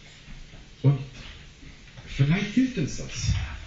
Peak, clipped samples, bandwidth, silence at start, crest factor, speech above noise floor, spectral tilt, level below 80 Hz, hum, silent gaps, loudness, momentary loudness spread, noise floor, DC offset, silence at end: -8 dBFS; under 0.1%; 7.8 kHz; 0 s; 18 dB; 21 dB; -6.5 dB/octave; -40 dBFS; none; none; -26 LUFS; 23 LU; -46 dBFS; under 0.1%; 0 s